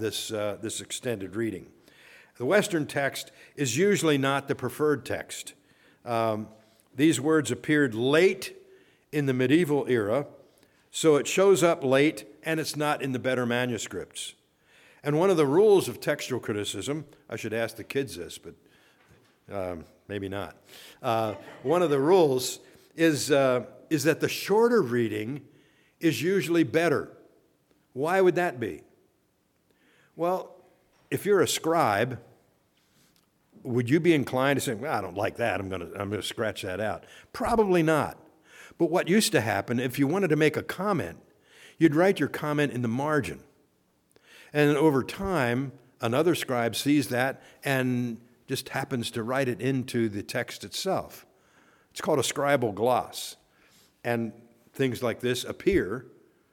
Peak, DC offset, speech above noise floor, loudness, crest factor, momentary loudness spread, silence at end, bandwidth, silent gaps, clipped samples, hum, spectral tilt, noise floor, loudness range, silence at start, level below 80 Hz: -8 dBFS; under 0.1%; 44 dB; -27 LUFS; 20 dB; 14 LU; 0.5 s; 18.5 kHz; none; under 0.1%; none; -5 dB/octave; -70 dBFS; 5 LU; 0 s; -60 dBFS